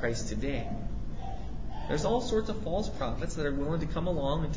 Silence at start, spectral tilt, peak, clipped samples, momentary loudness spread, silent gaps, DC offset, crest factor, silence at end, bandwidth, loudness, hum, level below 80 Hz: 0 s; -6 dB/octave; -16 dBFS; under 0.1%; 11 LU; none; 2%; 16 dB; 0 s; 7.8 kHz; -33 LUFS; none; -38 dBFS